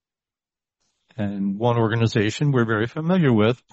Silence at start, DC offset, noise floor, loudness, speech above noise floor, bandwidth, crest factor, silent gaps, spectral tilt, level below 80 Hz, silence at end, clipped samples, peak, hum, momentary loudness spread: 1.15 s; under 0.1%; under -90 dBFS; -21 LUFS; over 70 dB; 8.2 kHz; 16 dB; none; -7 dB/octave; -58 dBFS; 0.2 s; under 0.1%; -6 dBFS; none; 9 LU